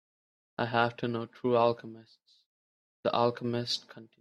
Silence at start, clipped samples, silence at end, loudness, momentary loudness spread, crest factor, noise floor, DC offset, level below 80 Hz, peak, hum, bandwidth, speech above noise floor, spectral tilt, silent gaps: 0.6 s; under 0.1%; 0.15 s; -31 LUFS; 10 LU; 22 dB; under -90 dBFS; under 0.1%; -74 dBFS; -10 dBFS; none; 12 kHz; over 59 dB; -5.5 dB/octave; 2.46-3.03 s